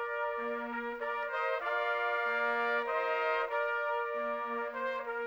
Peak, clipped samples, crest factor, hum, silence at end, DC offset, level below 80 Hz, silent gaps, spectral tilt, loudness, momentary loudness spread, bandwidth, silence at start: -20 dBFS; under 0.1%; 14 dB; none; 0 s; under 0.1%; -70 dBFS; none; -3.5 dB/octave; -33 LUFS; 5 LU; over 20 kHz; 0 s